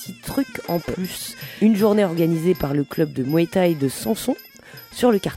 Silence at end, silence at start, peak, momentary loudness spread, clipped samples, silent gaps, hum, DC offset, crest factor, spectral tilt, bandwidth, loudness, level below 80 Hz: 0 s; 0 s; -4 dBFS; 12 LU; under 0.1%; none; none; under 0.1%; 16 dB; -6 dB/octave; 16.5 kHz; -21 LUFS; -50 dBFS